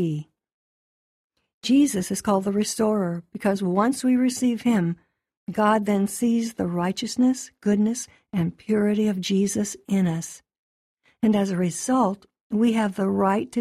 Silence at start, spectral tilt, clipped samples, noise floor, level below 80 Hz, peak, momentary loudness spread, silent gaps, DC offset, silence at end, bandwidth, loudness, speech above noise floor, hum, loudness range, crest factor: 0 s; -5.5 dB/octave; under 0.1%; under -90 dBFS; -62 dBFS; -8 dBFS; 8 LU; 0.54-1.30 s, 1.54-1.61 s, 5.37-5.47 s, 10.59-10.97 s, 12.41-12.50 s; under 0.1%; 0 s; 14.5 kHz; -23 LUFS; over 68 dB; none; 2 LU; 16 dB